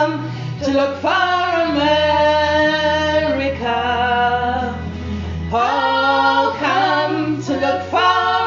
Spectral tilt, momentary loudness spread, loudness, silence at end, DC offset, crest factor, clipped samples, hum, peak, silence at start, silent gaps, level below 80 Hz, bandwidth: -2.5 dB/octave; 9 LU; -17 LUFS; 0 s; under 0.1%; 14 dB; under 0.1%; none; -2 dBFS; 0 s; none; -38 dBFS; 7.6 kHz